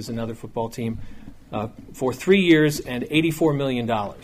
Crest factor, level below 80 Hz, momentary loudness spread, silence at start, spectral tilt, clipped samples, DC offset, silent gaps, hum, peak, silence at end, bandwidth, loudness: 18 dB; -46 dBFS; 14 LU; 0 s; -6 dB/octave; under 0.1%; under 0.1%; none; none; -6 dBFS; 0 s; 15.5 kHz; -22 LUFS